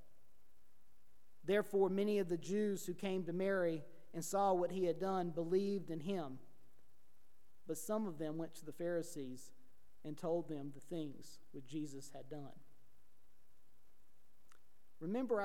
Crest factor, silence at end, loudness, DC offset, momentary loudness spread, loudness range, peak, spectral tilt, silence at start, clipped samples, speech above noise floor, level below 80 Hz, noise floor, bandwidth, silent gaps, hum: 20 dB; 0 s; -41 LUFS; 0.4%; 16 LU; 13 LU; -24 dBFS; -6 dB/octave; 1.45 s; under 0.1%; 37 dB; -82 dBFS; -77 dBFS; 17 kHz; none; none